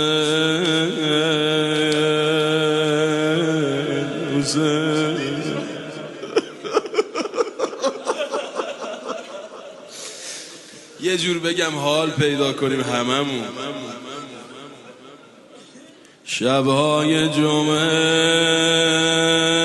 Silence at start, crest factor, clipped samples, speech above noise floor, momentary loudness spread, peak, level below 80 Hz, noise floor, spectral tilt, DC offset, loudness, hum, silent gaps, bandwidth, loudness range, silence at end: 0 s; 18 dB; under 0.1%; 27 dB; 17 LU; -2 dBFS; -62 dBFS; -46 dBFS; -4 dB/octave; under 0.1%; -19 LUFS; none; none; 11.5 kHz; 9 LU; 0 s